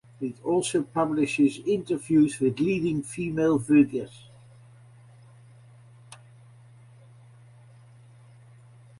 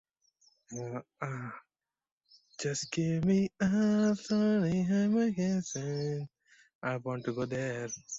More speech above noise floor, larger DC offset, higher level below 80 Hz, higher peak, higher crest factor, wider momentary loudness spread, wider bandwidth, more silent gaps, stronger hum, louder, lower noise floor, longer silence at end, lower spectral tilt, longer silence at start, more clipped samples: second, 28 dB vs 39 dB; neither; about the same, -62 dBFS vs -66 dBFS; first, -8 dBFS vs -18 dBFS; first, 20 dB vs 14 dB; second, 10 LU vs 14 LU; first, 11.5 kHz vs 8 kHz; second, none vs 2.12-2.21 s, 6.75-6.81 s; neither; first, -25 LUFS vs -32 LUFS; second, -52 dBFS vs -70 dBFS; first, 2.85 s vs 0 s; about the same, -6 dB/octave vs -6 dB/octave; second, 0.2 s vs 0.7 s; neither